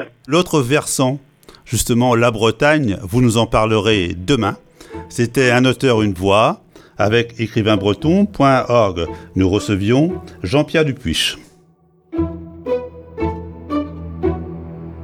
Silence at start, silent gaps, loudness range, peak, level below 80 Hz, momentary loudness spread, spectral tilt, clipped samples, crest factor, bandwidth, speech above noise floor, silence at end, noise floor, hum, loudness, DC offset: 0 s; none; 7 LU; 0 dBFS; -38 dBFS; 14 LU; -5 dB/octave; under 0.1%; 16 dB; 17.5 kHz; 38 dB; 0 s; -53 dBFS; none; -17 LUFS; under 0.1%